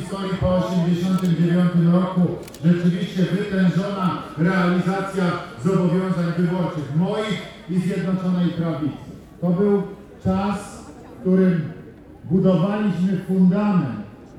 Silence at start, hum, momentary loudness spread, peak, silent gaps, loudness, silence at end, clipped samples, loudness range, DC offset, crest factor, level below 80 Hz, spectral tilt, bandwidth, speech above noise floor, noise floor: 0 s; none; 10 LU; -6 dBFS; none; -21 LUFS; 0 s; under 0.1%; 3 LU; under 0.1%; 16 dB; -46 dBFS; -8 dB/octave; 11.5 kHz; 21 dB; -40 dBFS